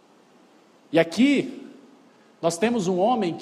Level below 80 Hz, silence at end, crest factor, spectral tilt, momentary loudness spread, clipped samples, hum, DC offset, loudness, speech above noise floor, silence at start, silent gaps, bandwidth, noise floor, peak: -70 dBFS; 0 s; 18 dB; -5 dB/octave; 9 LU; under 0.1%; none; under 0.1%; -23 LUFS; 34 dB; 0.9 s; none; 13.5 kHz; -56 dBFS; -6 dBFS